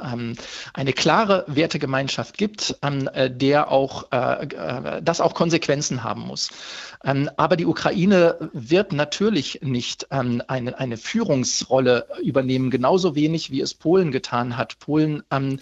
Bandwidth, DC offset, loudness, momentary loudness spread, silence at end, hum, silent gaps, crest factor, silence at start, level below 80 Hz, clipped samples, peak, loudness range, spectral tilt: 8.2 kHz; under 0.1%; -22 LUFS; 9 LU; 0 s; none; none; 20 dB; 0 s; -58 dBFS; under 0.1%; -2 dBFS; 2 LU; -5 dB/octave